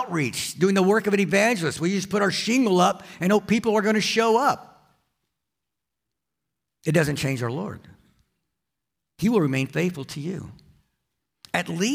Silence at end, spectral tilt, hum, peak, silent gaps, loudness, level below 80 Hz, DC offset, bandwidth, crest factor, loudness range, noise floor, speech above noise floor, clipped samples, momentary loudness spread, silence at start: 0 s; -5 dB/octave; none; -6 dBFS; none; -23 LUFS; -62 dBFS; under 0.1%; 16 kHz; 18 dB; 8 LU; -85 dBFS; 62 dB; under 0.1%; 12 LU; 0 s